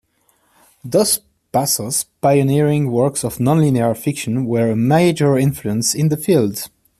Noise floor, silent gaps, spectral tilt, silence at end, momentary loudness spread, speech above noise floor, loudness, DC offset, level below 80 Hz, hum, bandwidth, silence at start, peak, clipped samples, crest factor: -61 dBFS; none; -5.5 dB/octave; 0.35 s; 6 LU; 45 dB; -17 LUFS; under 0.1%; -52 dBFS; none; 14.5 kHz; 0.85 s; -2 dBFS; under 0.1%; 16 dB